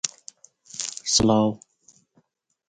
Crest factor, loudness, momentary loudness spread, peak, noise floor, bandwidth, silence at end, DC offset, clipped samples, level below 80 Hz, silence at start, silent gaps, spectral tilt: 26 dB; -22 LUFS; 21 LU; 0 dBFS; -68 dBFS; 9.6 kHz; 1.1 s; under 0.1%; under 0.1%; -52 dBFS; 0.05 s; none; -3.5 dB/octave